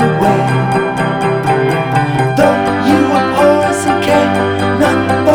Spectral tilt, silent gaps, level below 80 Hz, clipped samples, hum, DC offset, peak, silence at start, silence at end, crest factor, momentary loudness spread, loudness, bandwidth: -6 dB/octave; none; -40 dBFS; under 0.1%; none; under 0.1%; 0 dBFS; 0 s; 0 s; 12 dB; 4 LU; -12 LUFS; 18 kHz